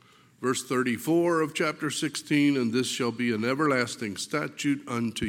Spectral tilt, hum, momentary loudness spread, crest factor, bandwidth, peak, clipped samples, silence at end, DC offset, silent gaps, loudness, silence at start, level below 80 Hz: -4.5 dB/octave; none; 7 LU; 16 dB; 17 kHz; -10 dBFS; under 0.1%; 0 s; under 0.1%; none; -27 LUFS; 0.4 s; -72 dBFS